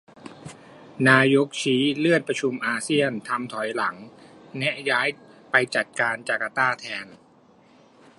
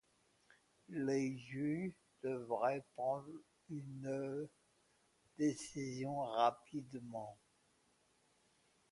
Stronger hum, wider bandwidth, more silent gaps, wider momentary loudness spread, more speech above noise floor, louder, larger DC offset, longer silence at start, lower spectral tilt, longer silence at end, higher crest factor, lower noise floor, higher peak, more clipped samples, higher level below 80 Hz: neither; about the same, 11.5 kHz vs 11.5 kHz; neither; first, 22 LU vs 13 LU; about the same, 32 dB vs 35 dB; first, -23 LUFS vs -42 LUFS; neither; second, 0.25 s vs 0.9 s; second, -4.5 dB/octave vs -6 dB/octave; second, 1.05 s vs 1.55 s; about the same, 22 dB vs 22 dB; second, -55 dBFS vs -76 dBFS; first, -2 dBFS vs -20 dBFS; neither; first, -72 dBFS vs -82 dBFS